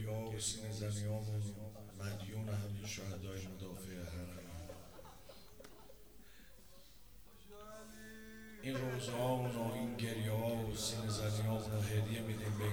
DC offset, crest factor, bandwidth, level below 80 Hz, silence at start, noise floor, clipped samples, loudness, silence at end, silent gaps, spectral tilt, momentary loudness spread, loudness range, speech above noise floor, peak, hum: 0.1%; 16 dB; over 20 kHz; -60 dBFS; 0 s; -62 dBFS; under 0.1%; -41 LUFS; 0 s; none; -5 dB/octave; 23 LU; 18 LU; 21 dB; -26 dBFS; none